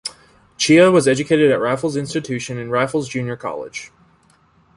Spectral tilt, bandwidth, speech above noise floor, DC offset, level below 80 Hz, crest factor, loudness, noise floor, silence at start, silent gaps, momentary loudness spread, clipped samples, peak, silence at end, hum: -5 dB/octave; 11.5 kHz; 38 dB; under 0.1%; -56 dBFS; 16 dB; -17 LUFS; -55 dBFS; 0.05 s; none; 16 LU; under 0.1%; -2 dBFS; 0.9 s; none